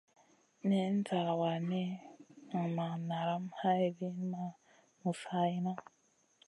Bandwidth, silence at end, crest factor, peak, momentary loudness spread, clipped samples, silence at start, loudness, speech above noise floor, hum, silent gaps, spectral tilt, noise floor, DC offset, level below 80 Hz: 11 kHz; 0.65 s; 16 dB; -20 dBFS; 9 LU; under 0.1%; 0.65 s; -36 LUFS; 37 dB; none; none; -7.5 dB/octave; -72 dBFS; under 0.1%; -86 dBFS